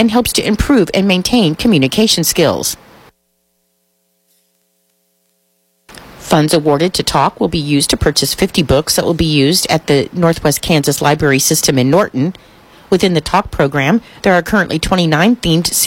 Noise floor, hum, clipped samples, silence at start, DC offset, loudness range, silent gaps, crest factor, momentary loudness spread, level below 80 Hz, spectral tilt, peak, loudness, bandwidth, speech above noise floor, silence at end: -63 dBFS; none; under 0.1%; 0 s; under 0.1%; 6 LU; none; 14 dB; 4 LU; -34 dBFS; -4 dB/octave; 0 dBFS; -12 LUFS; 16.5 kHz; 51 dB; 0 s